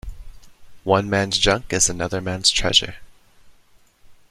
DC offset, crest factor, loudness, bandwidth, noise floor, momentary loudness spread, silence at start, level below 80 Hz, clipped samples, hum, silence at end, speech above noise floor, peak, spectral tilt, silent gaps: under 0.1%; 22 dB; -19 LUFS; 14.5 kHz; -54 dBFS; 13 LU; 0.05 s; -38 dBFS; under 0.1%; none; 0.15 s; 34 dB; 0 dBFS; -2.5 dB/octave; none